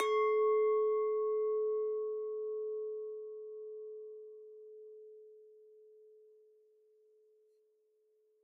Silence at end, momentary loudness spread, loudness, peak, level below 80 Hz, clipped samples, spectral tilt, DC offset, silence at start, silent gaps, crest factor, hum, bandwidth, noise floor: 2.95 s; 23 LU; -35 LUFS; -18 dBFS; under -90 dBFS; under 0.1%; 2 dB/octave; under 0.1%; 0 s; none; 18 dB; none; 6 kHz; -74 dBFS